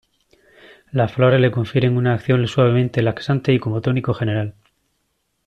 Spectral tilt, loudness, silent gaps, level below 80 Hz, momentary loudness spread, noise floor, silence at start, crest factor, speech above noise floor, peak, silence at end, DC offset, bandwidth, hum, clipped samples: -8 dB/octave; -18 LUFS; none; -52 dBFS; 6 LU; -70 dBFS; 0.95 s; 16 dB; 52 dB; -4 dBFS; 0.95 s; under 0.1%; 7.6 kHz; none; under 0.1%